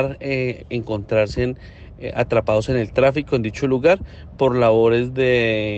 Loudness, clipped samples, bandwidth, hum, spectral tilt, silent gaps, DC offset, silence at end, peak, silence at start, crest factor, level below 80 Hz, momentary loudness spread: -19 LUFS; under 0.1%; 8.4 kHz; none; -7 dB/octave; none; under 0.1%; 0 s; -4 dBFS; 0 s; 16 dB; -40 dBFS; 10 LU